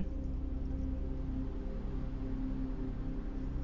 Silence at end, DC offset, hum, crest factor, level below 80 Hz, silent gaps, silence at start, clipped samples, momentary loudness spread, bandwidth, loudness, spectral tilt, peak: 0 s; under 0.1%; none; 14 dB; -38 dBFS; none; 0 s; under 0.1%; 3 LU; 5.8 kHz; -41 LUFS; -9.5 dB/octave; -22 dBFS